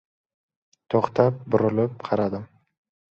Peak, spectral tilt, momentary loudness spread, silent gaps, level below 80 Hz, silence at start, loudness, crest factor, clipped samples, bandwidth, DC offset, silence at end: -4 dBFS; -9 dB/octave; 6 LU; none; -60 dBFS; 0.9 s; -23 LUFS; 22 dB; under 0.1%; 7 kHz; under 0.1%; 0.7 s